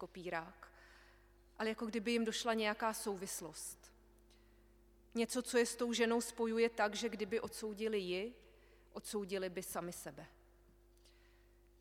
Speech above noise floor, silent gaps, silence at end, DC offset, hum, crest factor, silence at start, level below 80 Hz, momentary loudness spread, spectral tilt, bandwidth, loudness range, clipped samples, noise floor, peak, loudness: 27 dB; none; 1.5 s; under 0.1%; 50 Hz at -70 dBFS; 20 dB; 0 s; -68 dBFS; 15 LU; -3 dB/octave; 17 kHz; 7 LU; under 0.1%; -67 dBFS; -20 dBFS; -39 LUFS